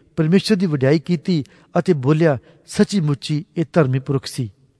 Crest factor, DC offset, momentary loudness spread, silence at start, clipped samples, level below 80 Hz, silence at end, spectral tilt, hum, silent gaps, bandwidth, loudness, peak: 16 dB; under 0.1%; 8 LU; 0.15 s; under 0.1%; -56 dBFS; 0.3 s; -7 dB/octave; none; none; 11 kHz; -19 LUFS; -2 dBFS